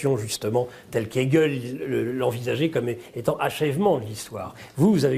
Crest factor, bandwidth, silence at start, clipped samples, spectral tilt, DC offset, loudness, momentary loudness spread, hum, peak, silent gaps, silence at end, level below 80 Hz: 18 dB; 15.5 kHz; 0 s; under 0.1%; -6 dB/octave; under 0.1%; -25 LUFS; 10 LU; none; -6 dBFS; none; 0 s; -58 dBFS